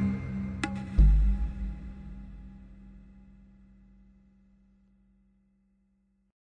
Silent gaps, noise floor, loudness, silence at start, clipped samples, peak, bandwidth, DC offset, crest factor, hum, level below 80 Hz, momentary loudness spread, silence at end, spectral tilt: none; -71 dBFS; -30 LUFS; 0 s; under 0.1%; -10 dBFS; 9.2 kHz; under 0.1%; 20 dB; none; -32 dBFS; 28 LU; 3.6 s; -7.5 dB/octave